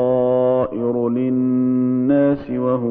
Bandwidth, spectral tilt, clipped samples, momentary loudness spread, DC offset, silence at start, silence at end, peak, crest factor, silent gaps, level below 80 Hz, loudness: 3.7 kHz; -12.5 dB/octave; under 0.1%; 4 LU; under 0.1%; 0 s; 0 s; -6 dBFS; 12 dB; none; -52 dBFS; -18 LUFS